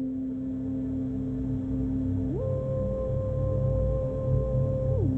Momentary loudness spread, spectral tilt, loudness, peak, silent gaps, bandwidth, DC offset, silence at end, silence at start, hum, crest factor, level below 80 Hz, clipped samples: 5 LU; -12 dB/octave; -29 LUFS; -14 dBFS; none; 3.5 kHz; under 0.1%; 0 s; 0 s; none; 12 dB; -36 dBFS; under 0.1%